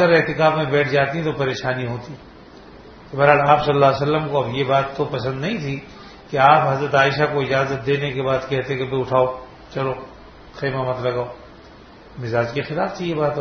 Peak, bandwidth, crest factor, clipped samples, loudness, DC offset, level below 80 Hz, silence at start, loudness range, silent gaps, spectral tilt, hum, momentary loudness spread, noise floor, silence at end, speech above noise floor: 0 dBFS; 6.6 kHz; 20 dB; under 0.1%; -19 LUFS; under 0.1%; -50 dBFS; 0 s; 7 LU; none; -6.5 dB/octave; none; 17 LU; -43 dBFS; 0 s; 24 dB